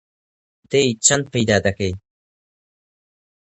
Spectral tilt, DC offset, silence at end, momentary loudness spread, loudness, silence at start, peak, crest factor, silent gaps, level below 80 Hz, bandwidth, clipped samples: -3.5 dB/octave; under 0.1%; 1.45 s; 11 LU; -18 LUFS; 0.7 s; 0 dBFS; 22 dB; none; -44 dBFS; 10.5 kHz; under 0.1%